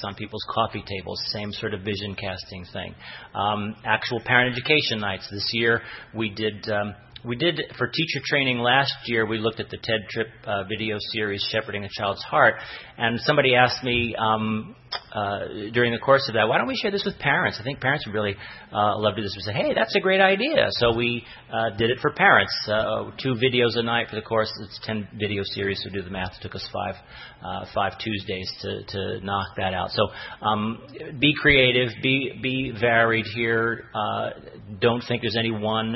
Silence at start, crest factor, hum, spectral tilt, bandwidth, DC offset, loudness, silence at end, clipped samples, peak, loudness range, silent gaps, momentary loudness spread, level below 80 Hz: 0 s; 22 dB; none; -6 dB/octave; 6 kHz; under 0.1%; -23 LUFS; 0 s; under 0.1%; -2 dBFS; 8 LU; none; 13 LU; -52 dBFS